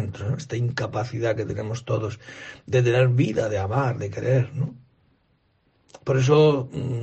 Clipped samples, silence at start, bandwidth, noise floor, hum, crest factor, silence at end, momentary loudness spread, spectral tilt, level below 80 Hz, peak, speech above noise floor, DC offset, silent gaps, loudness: under 0.1%; 0 s; 8.2 kHz; -66 dBFS; none; 18 dB; 0 s; 12 LU; -7 dB/octave; -54 dBFS; -6 dBFS; 43 dB; under 0.1%; none; -23 LUFS